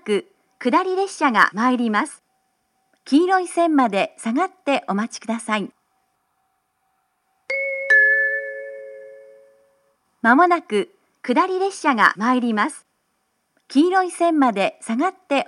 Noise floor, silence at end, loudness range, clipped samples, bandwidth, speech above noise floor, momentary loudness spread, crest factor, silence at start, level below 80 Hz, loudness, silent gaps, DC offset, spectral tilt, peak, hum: -70 dBFS; 0.05 s; 4 LU; under 0.1%; 12 kHz; 51 dB; 11 LU; 20 dB; 0.05 s; -80 dBFS; -19 LUFS; none; under 0.1%; -4.5 dB/octave; 0 dBFS; none